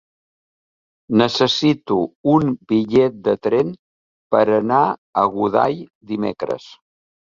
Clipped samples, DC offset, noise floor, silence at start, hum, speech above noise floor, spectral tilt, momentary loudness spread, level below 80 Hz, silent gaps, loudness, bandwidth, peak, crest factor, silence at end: under 0.1%; under 0.1%; under -90 dBFS; 1.1 s; none; over 72 dB; -6.5 dB/octave; 9 LU; -58 dBFS; 2.15-2.24 s, 3.79-4.30 s, 4.98-5.13 s, 5.95-6.01 s; -18 LUFS; 7.6 kHz; -2 dBFS; 18 dB; 0.55 s